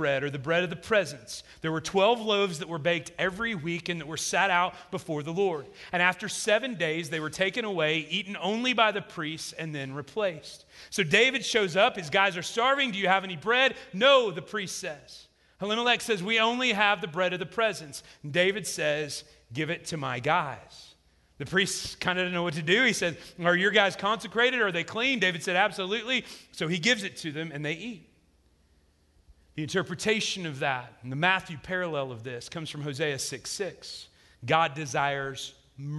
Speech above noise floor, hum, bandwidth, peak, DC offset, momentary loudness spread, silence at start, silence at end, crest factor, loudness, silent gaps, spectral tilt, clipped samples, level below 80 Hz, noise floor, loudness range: 37 dB; none; 12.5 kHz; -8 dBFS; under 0.1%; 14 LU; 0 s; 0 s; 22 dB; -27 LUFS; none; -3.5 dB/octave; under 0.1%; -64 dBFS; -65 dBFS; 6 LU